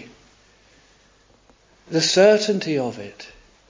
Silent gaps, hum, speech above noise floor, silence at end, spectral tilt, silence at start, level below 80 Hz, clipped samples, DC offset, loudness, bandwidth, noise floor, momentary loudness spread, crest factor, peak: none; none; 37 dB; 0.45 s; -4 dB/octave; 0 s; -60 dBFS; under 0.1%; under 0.1%; -19 LUFS; 7.6 kHz; -56 dBFS; 25 LU; 20 dB; -4 dBFS